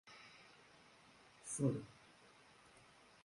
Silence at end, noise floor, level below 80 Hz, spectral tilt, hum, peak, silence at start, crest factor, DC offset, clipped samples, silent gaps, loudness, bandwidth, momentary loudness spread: 1.3 s; -66 dBFS; -78 dBFS; -5.5 dB/octave; none; -24 dBFS; 0.05 s; 24 dB; under 0.1%; under 0.1%; none; -43 LUFS; 11.5 kHz; 24 LU